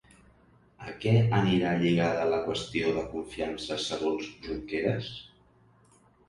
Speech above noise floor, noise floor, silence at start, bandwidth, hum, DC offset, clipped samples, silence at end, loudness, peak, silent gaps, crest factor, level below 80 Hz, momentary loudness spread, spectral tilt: 33 dB; -62 dBFS; 0.8 s; 11.5 kHz; none; under 0.1%; under 0.1%; 1 s; -29 LUFS; -10 dBFS; none; 20 dB; -54 dBFS; 13 LU; -6.5 dB/octave